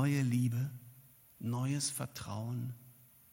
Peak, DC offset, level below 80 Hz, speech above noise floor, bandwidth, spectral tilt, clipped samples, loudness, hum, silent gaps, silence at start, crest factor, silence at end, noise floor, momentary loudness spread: -20 dBFS; under 0.1%; -70 dBFS; 26 dB; 17 kHz; -5.5 dB/octave; under 0.1%; -37 LUFS; none; none; 0 s; 18 dB; 0.4 s; -61 dBFS; 17 LU